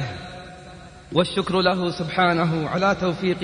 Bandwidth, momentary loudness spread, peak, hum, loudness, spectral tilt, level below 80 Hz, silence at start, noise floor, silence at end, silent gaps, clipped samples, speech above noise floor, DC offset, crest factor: 10 kHz; 19 LU; -6 dBFS; none; -22 LUFS; -6 dB/octave; -50 dBFS; 0 s; -42 dBFS; 0 s; none; under 0.1%; 21 dB; under 0.1%; 18 dB